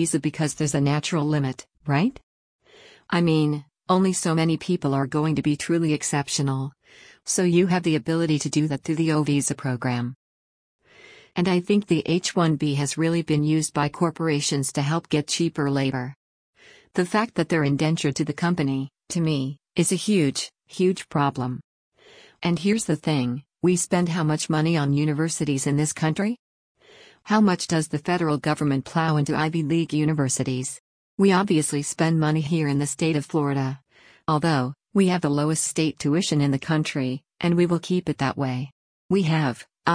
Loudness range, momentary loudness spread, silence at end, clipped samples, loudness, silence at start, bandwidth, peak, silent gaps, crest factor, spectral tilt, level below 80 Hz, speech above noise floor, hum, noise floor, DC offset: 2 LU; 7 LU; 0 s; under 0.1%; -23 LUFS; 0 s; 10.5 kHz; -6 dBFS; 2.23-2.59 s, 10.16-10.79 s, 16.16-16.53 s, 21.64-21.92 s, 26.39-26.75 s, 30.80-31.18 s, 38.72-39.09 s; 18 dB; -5.5 dB/octave; -60 dBFS; 30 dB; none; -52 dBFS; under 0.1%